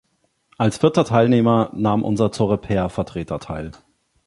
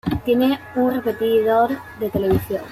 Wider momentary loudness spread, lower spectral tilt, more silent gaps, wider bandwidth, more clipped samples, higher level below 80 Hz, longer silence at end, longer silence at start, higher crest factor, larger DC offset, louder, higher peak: first, 13 LU vs 5 LU; about the same, -7 dB/octave vs -7.5 dB/octave; neither; second, 11.5 kHz vs 15.5 kHz; neither; about the same, -44 dBFS vs -44 dBFS; first, 0.55 s vs 0 s; first, 0.6 s vs 0.05 s; about the same, 18 dB vs 14 dB; neither; about the same, -19 LUFS vs -20 LUFS; first, 0 dBFS vs -6 dBFS